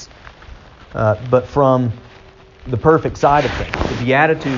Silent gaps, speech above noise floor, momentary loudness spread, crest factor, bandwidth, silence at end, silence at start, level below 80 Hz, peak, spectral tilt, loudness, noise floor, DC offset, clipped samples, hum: none; 27 dB; 15 LU; 16 dB; 7.4 kHz; 0 s; 0 s; -36 dBFS; -2 dBFS; -5.5 dB/octave; -16 LUFS; -43 dBFS; under 0.1%; under 0.1%; none